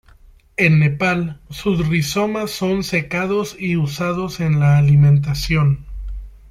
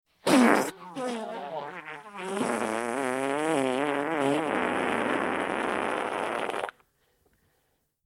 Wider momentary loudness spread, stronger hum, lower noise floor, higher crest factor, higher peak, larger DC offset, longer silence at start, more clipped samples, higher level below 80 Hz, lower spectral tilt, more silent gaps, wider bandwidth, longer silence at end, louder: about the same, 12 LU vs 13 LU; neither; second, -47 dBFS vs -73 dBFS; second, 14 dB vs 24 dB; about the same, -2 dBFS vs -4 dBFS; neither; first, 0.6 s vs 0.25 s; neither; first, -36 dBFS vs -68 dBFS; first, -6.5 dB/octave vs -4 dB/octave; neither; about the same, 15 kHz vs 16.5 kHz; second, 0.15 s vs 1.35 s; first, -17 LUFS vs -28 LUFS